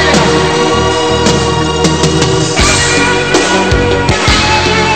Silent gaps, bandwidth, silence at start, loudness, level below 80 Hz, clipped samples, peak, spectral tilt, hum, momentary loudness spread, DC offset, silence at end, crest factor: none; 16 kHz; 0 s; -9 LUFS; -22 dBFS; under 0.1%; 0 dBFS; -4 dB/octave; none; 3 LU; 2%; 0 s; 10 dB